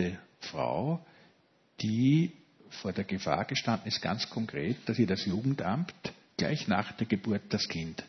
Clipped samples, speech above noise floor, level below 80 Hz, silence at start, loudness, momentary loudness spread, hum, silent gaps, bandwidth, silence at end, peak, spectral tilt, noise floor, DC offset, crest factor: under 0.1%; 36 dB; -66 dBFS; 0 s; -32 LUFS; 9 LU; none; none; 6.4 kHz; 0 s; -12 dBFS; -6 dB/octave; -67 dBFS; under 0.1%; 20 dB